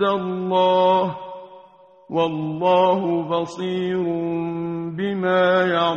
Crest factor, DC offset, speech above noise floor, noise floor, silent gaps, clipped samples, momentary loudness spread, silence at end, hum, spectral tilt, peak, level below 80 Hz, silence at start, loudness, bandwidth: 14 dB; under 0.1%; 29 dB; -49 dBFS; none; under 0.1%; 10 LU; 0 s; none; -7 dB/octave; -6 dBFS; -62 dBFS; 0 s; -21 LUFS; 8 kHz